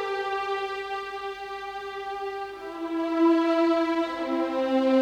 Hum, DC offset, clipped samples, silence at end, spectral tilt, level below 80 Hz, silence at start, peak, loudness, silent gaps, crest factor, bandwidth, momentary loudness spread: none; under 0.1%; under 0.1%; 0 s; -4.5 dB/octave; -64 dBFS; 0 s; -12 dBFS; -27 LUFS; none; 14 dB; 8.8 kHz; 13 LU